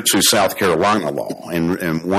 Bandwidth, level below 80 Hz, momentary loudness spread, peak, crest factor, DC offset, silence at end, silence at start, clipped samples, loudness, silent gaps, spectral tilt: 17 kHz; -50 dBFS; 11 LU; -4 dBFS; 14 dB; under 0.1%; 0 s; 0 s; under 0.1%; -17 LUFS; none; -3 dB/octave